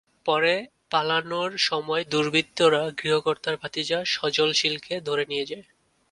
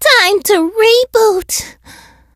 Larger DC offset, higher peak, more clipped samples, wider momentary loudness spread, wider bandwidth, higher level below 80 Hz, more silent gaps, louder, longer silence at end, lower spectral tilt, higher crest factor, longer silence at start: neither; second, -6 dBFS vs 0 dBFS; neither; about the same, 8 LU vs 10 LU; second, 11.5 kHz vs 16.5 kHz; second, -68 dBFS vs -46 dBFS; neither; second, -24 LUFS vs -11 LUFS; second, 0.5 s vs 0.65 s; first, -3.5 dB/octave vs -1 dB/octave; first, 18 dB vs 12 dB; first, 0.25 s vs 0 s